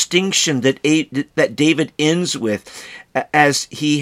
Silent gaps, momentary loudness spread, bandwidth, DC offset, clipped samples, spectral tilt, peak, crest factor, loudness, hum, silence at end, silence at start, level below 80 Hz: none; 10 LU; 15 kHz; under 0.1%; under 0.1%; -3.5 dB/octave; 0 dBFS; 18 dB; -17 LUFS; none; 0 s; 0 s; -62 dBFS